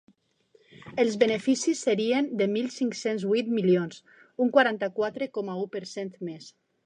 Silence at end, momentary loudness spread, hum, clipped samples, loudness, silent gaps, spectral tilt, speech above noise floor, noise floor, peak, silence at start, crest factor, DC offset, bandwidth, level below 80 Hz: 0.35 s; 13 LU; none; under 0.1%; -27 LUFS; none; -5 dB/octave; 38 dB; -64 dBFS; -6 dBFS; 0.85 s; 22 dB; under 0.1%; 10 kHz; -76 dBFS